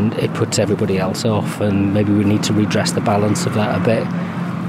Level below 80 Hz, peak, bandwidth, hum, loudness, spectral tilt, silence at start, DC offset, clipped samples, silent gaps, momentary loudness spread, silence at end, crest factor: -54 dBFS; -4 dBFS; 15.5 kHz; none; -17 LUFS; -6 dB/octave; 0 s; under 0.1%; under 0.1%; none; 4 LU; 0 s; 12 dB